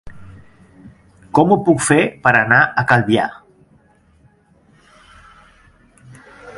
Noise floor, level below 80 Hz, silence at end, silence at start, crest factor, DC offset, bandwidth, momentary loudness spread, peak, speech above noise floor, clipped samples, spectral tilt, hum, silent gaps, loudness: -53 dBFS; -50 dBFS; 0 s; 0.05 s; 18 dB; under 0.1%; 11.5 kHz; 7 LU; 0 dBFS; 39 dB; under 0.1%; -5 dB/octave; none; none; -14 LUFS